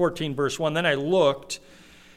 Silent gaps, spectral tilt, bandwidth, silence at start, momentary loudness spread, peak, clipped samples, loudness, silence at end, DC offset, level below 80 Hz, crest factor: none; -4.5 dB/octave; 15 kHz; 0 s; 13 LU; -8 dBFS; under 0.1%; -24 LUFS; 0.6 s; under 0.1%; -56 dBFS; 18 dB